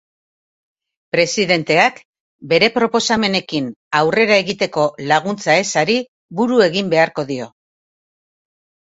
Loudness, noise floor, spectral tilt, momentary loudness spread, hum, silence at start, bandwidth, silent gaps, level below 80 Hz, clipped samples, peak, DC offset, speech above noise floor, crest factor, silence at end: -16 LUFS; under -90 dBFS; -4 dB/octave; 9 LU; none; 1.15 s; 8 kHz; 2.05-2.13 s, 2.20-2.39 s, 3.76-3.91 s, 6.08-6.29 s; -58 dBFS; under 0.1%; 0 dBFS; under 0.1%; over 74 dB; 18 dB; 1.35 s